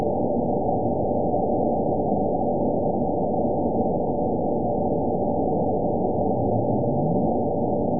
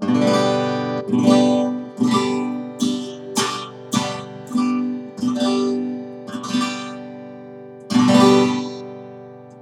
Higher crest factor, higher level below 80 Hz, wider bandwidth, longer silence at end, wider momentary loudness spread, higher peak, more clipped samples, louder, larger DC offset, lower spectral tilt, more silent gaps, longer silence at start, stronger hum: about the same, 14 dB vs 18 dB; first, -42 dBFS vs -66 dBFS; second, 1 kHz vs 12.5 kHz; about the same, 0 s vs 0 s; second, 1 LU vs 21 LU; second, -10 dBFS vs -2 dBFS; neither; second, -23 LUFS vs -20 LUFS; first, 2% vs under 0.1%; first, -18.5 dB/octave vs -5 dB/octave; neither; about the same, 0 s vs 0 s; second, none vs 50 Hz at -55 dBFS